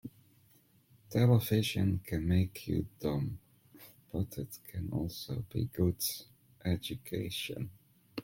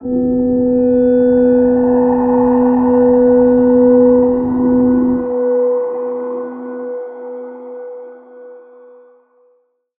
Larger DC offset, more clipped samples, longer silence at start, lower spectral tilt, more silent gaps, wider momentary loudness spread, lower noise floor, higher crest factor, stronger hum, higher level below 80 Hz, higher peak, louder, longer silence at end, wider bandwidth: neither; neither; about the same, 0.05 s vs 0 s; second, -6 dB/octave vs -13 dB/octave; neither; second, 15 LU vs 18 LU; first, -66 dBFS vs -58 dBFS; first, 20 dB vs 12 dB; neither; second, -56 dBFS vs -42 dBFS; second, -14 dBFS vs -2 dBFS; second, -34 LUFS vs -12 LUFS; second, 0 s vs 1.4 s; first, 17 kHz vs 2.6 kHz